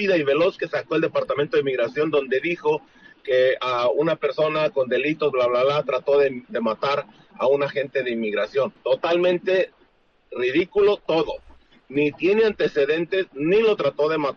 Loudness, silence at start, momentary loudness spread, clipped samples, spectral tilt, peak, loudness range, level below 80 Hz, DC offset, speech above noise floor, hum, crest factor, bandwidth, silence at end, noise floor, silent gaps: -22 LUFS; 0 s; 6 LU; under 0.1%; -6.5 dB/octave; -8 dBFS; 2 LU; -60 dBFS; under 0.1%; 38 dB; none; 12 dB; 6.8 kHz; 0 s; -60 dBFS; none